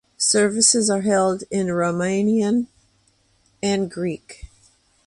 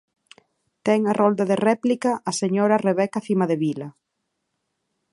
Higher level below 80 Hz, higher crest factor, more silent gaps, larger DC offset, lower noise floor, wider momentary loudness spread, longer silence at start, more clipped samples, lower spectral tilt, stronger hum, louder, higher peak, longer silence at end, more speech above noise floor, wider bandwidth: first, -54 dBFS vs -70 dBFS; about the same, 20 dB vs 18 dB; neither; neither; second, -62 dBFS vs -77 dBFS; first, 12 LU vs 7 LU; second, 0.2 s vs 0.85 s; neither; second, -3.5 dB/octave vs -6 dB/octave; neither; about the same, -20 LUFS vs -21 LUFS; about the same, -2 dBFS vs -4 dBFS; second, 0.6 s vs 1.2 s; second, 42 dB vs 57 dB; about the same, 11.5 kHz vs 11.5 kHz